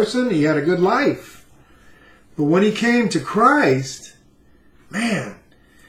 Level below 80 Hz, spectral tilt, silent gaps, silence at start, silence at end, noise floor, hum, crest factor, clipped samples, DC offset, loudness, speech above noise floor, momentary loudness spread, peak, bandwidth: -58 dBFS; -5.5 dB/octave; none; 0 s; 0.55 s; -52 dBFS; none; 18 dB; under 0.1%; under 0.1%; -18 LUFS; 34 dB; 16 LU; -2 dBFS; 15 kHz